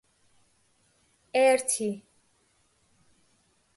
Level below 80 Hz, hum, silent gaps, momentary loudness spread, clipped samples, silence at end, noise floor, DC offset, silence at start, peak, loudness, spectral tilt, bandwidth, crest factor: -76 dBFS; none; none; 12 LU; under 0.1%; 1.75 s; -68 dBFS; under 0.1%; 1.35 s; -12 dBFS; -25 LUFS; -2.5 dB/octave; 12 kHz; 20 dB